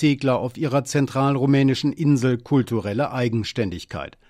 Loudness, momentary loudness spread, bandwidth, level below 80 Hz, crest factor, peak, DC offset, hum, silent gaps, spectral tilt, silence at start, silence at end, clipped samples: -21 LUFS; 8 LU; 13.5 kHz; -54 dBFS; 12 dB; -8 dBFS; under 0.1%; none; none; -6.5 dB/octave; 0 s; 0.2 s; under 0.1%